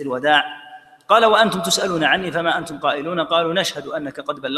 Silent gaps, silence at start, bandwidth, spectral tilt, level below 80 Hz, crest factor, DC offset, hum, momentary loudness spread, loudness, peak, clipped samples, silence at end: none; 0 s; 15 kHz; -3 dB/octave; -60 dBFS; 20 dB; under 0.1%; none; 13 LU; -18 LUFS; 0 dBFS; under 0.1%; 0 s